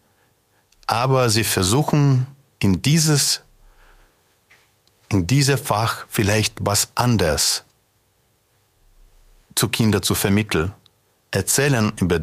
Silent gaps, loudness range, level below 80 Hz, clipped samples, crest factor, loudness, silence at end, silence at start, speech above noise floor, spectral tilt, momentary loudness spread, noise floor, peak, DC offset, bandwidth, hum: none; 4 LU; -46 dBFS; under 0.1%; 18 dB; -19 LUFS; 0 s; 0.9 s; 45 dB; -4 dB/octave; 7 LU; -63 dBFS; -2 dBFS; under 0.1%; 15.5 kHz; none